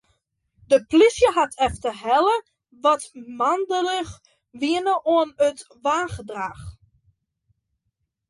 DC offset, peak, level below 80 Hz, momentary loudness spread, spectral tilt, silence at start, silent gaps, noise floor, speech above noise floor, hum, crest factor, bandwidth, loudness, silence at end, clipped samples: under 0.1%; -6 dBFS; -50 dBFS; 14 LU; -4 dB/octave; 0.7 s; none; -77 dBFS; 56 dB; none; 18 dB; 11.5 kHz; -22 LUFS; 1.6 s; under 0.1%